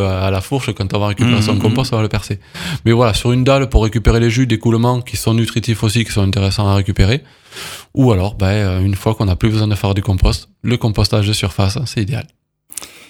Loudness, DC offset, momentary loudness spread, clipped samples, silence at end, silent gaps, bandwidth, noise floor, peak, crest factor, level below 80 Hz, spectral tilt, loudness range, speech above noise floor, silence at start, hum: -15 LUFS; under 0.1%; 9 LU; under 0.1%; 0.2 s; none; 16.5 kHz; -34 dBFS; 0 dBFS; 14 dB; -26 dBFS; -6 dB/octave; 2 LU; 19 dB; 0 s; none